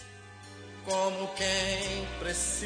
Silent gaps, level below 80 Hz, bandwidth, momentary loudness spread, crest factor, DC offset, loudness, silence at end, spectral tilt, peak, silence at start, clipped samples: none; -48 dBFS; 10.5 kHz; 19 LU; 20 dB; under 0.1%; -31 LUFS; 0 s; -2 dB/octave; -12 dBFS; 0 s; under 0.1%